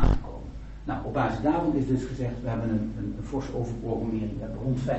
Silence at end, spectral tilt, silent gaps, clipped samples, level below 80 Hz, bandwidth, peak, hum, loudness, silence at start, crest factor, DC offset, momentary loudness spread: 0 s; -8.5 dB/octave; none; under 0.1%; -34 dBFS; 8.2 kHz; -8 dBFS; none; -29 LUFS; 0 s; 18 dB; under 0.1%; 9 LU